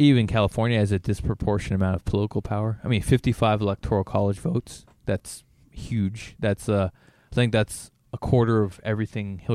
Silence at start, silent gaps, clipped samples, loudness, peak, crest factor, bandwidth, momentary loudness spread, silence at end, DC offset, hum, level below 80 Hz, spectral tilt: 0 s; none; under 0.1%; -25 LUFS; -6 dBFS; 18 dB; 14 kHz; 10 LU; 0 s; under 0.1%; none; -42 dBFS; -7 dB/octave